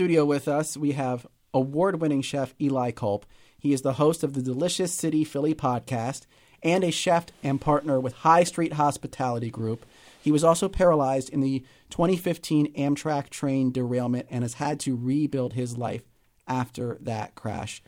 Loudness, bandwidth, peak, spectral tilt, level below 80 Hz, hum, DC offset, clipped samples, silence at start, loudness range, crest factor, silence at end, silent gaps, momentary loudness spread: -26 LUFS; 16.5 kHz; -6 dBFS; -6 dB/octave; -52 dBFS; none; under 0.1%; under 0.1%; 0 s; 4 LU; 20 dB; 0.1 s; none; 11 LU